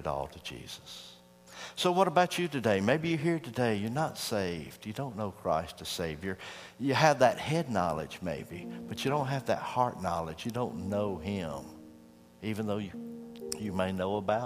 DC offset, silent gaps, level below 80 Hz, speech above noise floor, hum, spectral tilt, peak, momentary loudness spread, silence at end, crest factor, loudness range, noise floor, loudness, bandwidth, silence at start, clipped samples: under 0.1%; none; -60 dBFS; 24 dB; none; -5.5 dB/octave; -8 dBFS; 17 LU; 0 s; 24 dB; 6 LU; -56 dBFS; -32 LUFS; 15.5 kHz; 0 s; under 0.1%